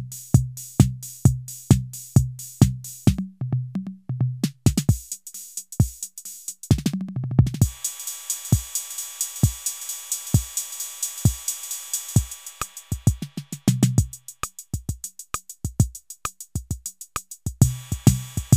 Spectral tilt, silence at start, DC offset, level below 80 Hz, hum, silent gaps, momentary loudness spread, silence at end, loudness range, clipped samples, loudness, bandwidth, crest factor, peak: -5.5 dB/octave; 0 s; under 0.1%; -36 dBFS; none; none; 12 LU; 0 s; 4 LU; under 0.1%; -25 LUFS; 16 kHz; 24 dB; 0 dBFS